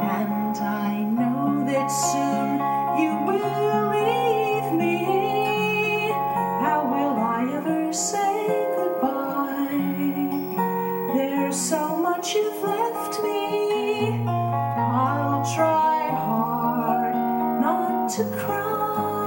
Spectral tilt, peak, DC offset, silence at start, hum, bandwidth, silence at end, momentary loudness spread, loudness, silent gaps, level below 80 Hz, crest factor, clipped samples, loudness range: -5 dB/octave; -10 dBFS; under 0.1%; 0 s; none; 19.5 kHz; 0 s; 3 LU; -23 LUFS; none; -78 dBFS; 14 dB; under 0.1%; 2 LU